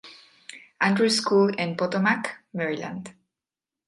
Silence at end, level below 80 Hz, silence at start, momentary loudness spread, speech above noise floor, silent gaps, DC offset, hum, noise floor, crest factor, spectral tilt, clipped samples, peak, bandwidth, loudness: 0.75 s; -72 dBFS; 0.05 s; 23 LU; 66 dB; none; under 0.1%; none; -90 dBFS; 18 dB; -4.5 dB/octave; under 0.1%; -8 dBFS; 11.5 kHz; -24 LUFS